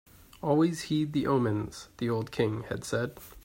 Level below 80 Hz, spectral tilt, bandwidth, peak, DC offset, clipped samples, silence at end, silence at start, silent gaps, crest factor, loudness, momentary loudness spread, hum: -58 dBFS; -6.5 dB/octave; 16 kHz; -12 dBFS; under 0.1%; under 0.1%; 0.05 s; 0.4 s; none; 18 dB; -30 LUFS; 9 LU; none